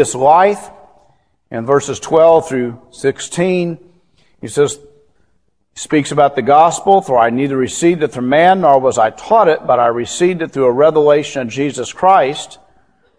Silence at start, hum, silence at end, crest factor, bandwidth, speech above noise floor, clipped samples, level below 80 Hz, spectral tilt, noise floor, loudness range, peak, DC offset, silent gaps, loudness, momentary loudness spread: 0 s; none; 0.65 s; 14 dB; 11 kHz; 50 dB; under 0.1%; -54 dBFS; -5 dB/octave; -63 dBFS; 6 LU; 0 dBFS; 0.2%; none; -13 LUFS; 13 LU